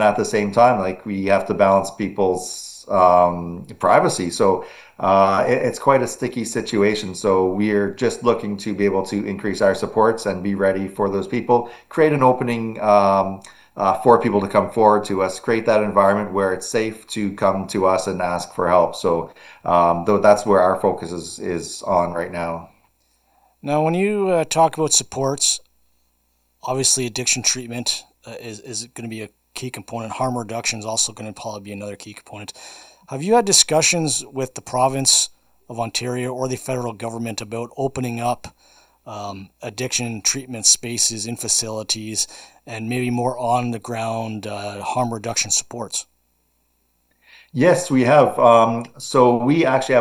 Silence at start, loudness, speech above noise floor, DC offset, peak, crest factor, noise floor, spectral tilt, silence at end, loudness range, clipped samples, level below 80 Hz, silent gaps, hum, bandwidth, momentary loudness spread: 0 s; -19 LUFS; 46 dB; under 0.1%; 0 dBFS; 20 dB; -66 dBFS; -3.5 dB/octave; 0 s; 8 LU; under 0.1%; -56 dBFS; none; none; 16.5 kHz; 16 LU